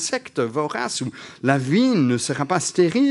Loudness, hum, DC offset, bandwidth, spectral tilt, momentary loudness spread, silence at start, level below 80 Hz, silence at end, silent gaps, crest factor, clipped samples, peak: -21 LUFS; none; under 0.1%; 11.5 kHz; -5 dB/octave; 8 LU; 0 s; -66 dBFS; 0 s; none; 20 dB; under 0.1%; -2 dBFS